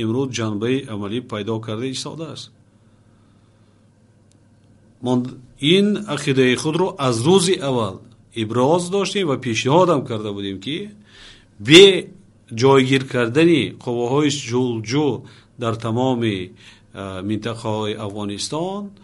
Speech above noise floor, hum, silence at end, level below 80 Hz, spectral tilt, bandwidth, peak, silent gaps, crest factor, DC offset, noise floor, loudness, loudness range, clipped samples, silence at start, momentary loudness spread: 35 dB; none; 0.1 s; -58 dBFS; -5 dB/octave; 11.5 kHz; 0 dBFS; none; 20 dB; under 0.1%; -54 dBFS; -19 LUFS; 14 LU; under 0.1%; 0 s; 14 LU